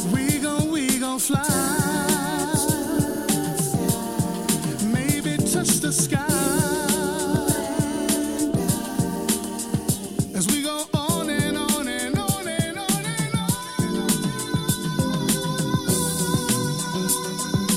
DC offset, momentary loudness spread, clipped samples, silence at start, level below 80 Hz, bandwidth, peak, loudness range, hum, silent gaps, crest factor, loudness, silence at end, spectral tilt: under 0.1%; 4 LU; under 0.1%; 0 s; -48 dBFS; 17 kHz; -6 dBFS; 2 LU; none; none; 16 dB; -23 LUFS; 0 s; -4 dB/octave